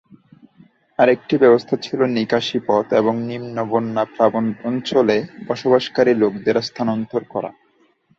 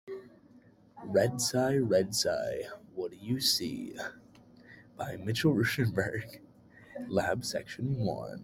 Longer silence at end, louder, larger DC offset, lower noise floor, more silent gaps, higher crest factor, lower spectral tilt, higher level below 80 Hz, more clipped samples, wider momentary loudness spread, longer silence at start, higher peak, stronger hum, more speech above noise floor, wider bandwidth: first, 0.7 s vs 0 s; first, -19 LUFS vs -31 LUFS; neither; about the same, -59 dBFS vs -59 dBFS; neither; about the same, 18 dB vs 18 dB; first, -6.5 dB/octave vs -4.5 dB/octave; about the same, -62 dBFS vs -64 dBFS; neither; second, 10 LU vs 15 LU; first, 1 s vs 0.05 s; first, -2 dBFS vs -14 dBFS; neither; first, 41 dB vs 28 dB; second, 7.6 kHz vs 16.5 kHz